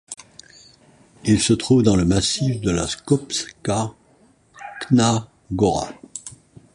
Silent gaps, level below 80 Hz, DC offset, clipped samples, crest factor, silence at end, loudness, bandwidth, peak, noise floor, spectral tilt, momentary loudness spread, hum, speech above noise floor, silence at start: none; -42 dBFS; under 0.1%; under 0.1%; 18 dB; 0.45 s; -20 LUFS; 11.5 kHz; -4 dBFS; -56 dBFS; -5 dB/octave; 19 LU; none; 37 dB; 0.1 s